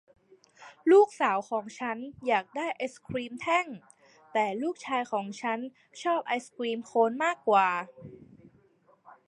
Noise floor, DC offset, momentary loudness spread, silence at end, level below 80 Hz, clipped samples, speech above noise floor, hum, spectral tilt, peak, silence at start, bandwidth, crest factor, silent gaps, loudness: -64 dBFS; under 0.1%; 13 LU; 1.1 s; -72 dBFS; under 0.1%; 36 dB; none; -4.5 dB/octave; -10 dBFS; 0.6 s; 11 kHz; 20 dB; none; -29 LUFS